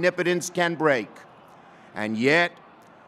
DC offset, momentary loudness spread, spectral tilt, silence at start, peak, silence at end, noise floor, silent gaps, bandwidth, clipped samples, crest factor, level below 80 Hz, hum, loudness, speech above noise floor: under 0.1%; 13 LU; -4.5 dB/octave; 0 s; -6 dBFS; 0.6 s; -50 dBFS; none; 15.5 kHz; under 0.1%; 20 dB; -78 dBFS; none; -23 LUFS; 26 dB